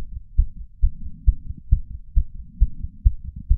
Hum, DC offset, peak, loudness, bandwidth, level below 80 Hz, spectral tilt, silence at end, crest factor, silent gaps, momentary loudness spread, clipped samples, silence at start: none; under 0.1%; -2 dBFS; -27 LUFS; 0.4 kHz; -22 dBFS; -17.5 dB/octave; 0 s; 20 dB; none; 5 LU; under 0.1%; 0 s